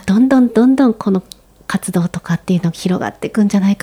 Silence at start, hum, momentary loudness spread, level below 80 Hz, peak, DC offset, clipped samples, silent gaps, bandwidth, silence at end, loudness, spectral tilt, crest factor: 0.05 s; none; 10 LU; -48 dBFS; -2 dBFS; under 0.1%; under 0.1%; none; 15 kHz; 0.1 s; -15 LUFS; -7 dB/octave; 14 dB